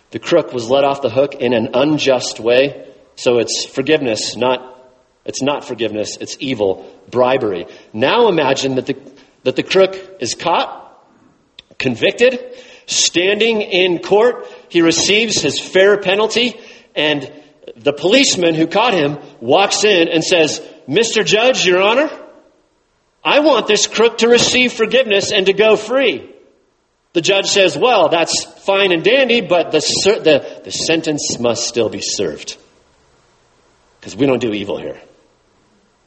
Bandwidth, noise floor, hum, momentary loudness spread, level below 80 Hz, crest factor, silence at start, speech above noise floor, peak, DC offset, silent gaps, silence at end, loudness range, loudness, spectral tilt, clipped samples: 8.8 kHz; -61 dBFS; none; 11 LU; -56 dBFS; 16 dB; 0.1 s; 46 dB; 0 dBFS; under 0.1%; none; 1.05 s; 6 LU; -14 LUFS; -3 dB/octave; under 0.1%